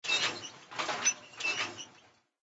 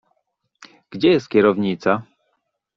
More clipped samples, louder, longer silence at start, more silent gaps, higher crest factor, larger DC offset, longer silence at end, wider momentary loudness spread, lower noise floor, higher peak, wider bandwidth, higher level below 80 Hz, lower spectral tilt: neither; second, -32 LUFS vs -18 LUFS; second, 0.05 s vs 0.9 s; neither; about the same, 20 dB vs 18 dB; neither; second, 0.5 s vs 0.75 s; first, 14 LU vs 8 LU; second, -63 dBFS vs -72 dBFS; second, -16 dBFS vs -2 dBFS; first, 8.2 kHz vs 7.2 kHz; second, -82 dBFS vs -60 dBFS; second, 0.5 dB/octave vs -7 dB/octave